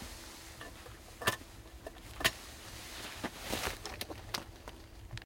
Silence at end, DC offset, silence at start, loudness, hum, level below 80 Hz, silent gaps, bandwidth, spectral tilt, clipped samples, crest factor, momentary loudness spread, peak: 0 s; under 0.1%; 0 s; -39 LUFS; none; -54 dBFS; none; 16.5 kHz; -2.5 dB/octave; under 0.1%; 30 dB; 17 LU; -12 dBFS